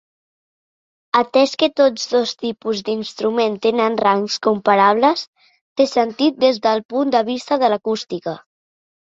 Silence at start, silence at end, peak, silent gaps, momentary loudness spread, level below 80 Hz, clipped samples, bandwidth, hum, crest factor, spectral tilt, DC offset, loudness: 1.15 s; 0.65 s; -2 dBFS; 5.27-5.33 s, 5.61-5.76 s, 6.85-6.89 s; 10 LU; -66 dBFS; under 0.1%; 7.8 kHz; none; 16 dB; -4.5 dB/octave; under 0.1%; -18 LUFS